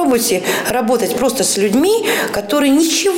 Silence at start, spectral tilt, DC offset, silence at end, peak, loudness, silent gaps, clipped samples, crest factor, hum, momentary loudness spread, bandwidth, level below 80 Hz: 0 s; -3 dB/octave; under 0.1%; 0 s; -4 dBFS; -14 LUFS; none; under 0.1%; 10 dB; none; 4 LU; 16.5 kHz; -48 dBFS